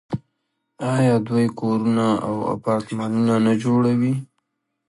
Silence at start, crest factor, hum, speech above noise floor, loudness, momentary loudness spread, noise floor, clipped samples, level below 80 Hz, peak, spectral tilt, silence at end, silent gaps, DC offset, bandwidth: 0.1 s; 14 dB; none; 55 dB; -21 LUFS; 7 LU; -75 dBFS; under 0.1%; -58 dBFS; -8 dBFS; -7.5 dB/octave; 0.65 s; none; under 0.1%; 11.5 kHz